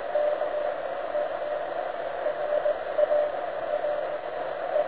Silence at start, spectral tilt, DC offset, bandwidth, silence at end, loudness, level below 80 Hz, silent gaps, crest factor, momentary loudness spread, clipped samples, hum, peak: 0 s; -7.5 dB/octave; 0.4%; 4 kHz; 0 s; -29 LUFS; -64 dBFS; none; 18 dB; 7 LU; under 0.1%; none; -10 dBFS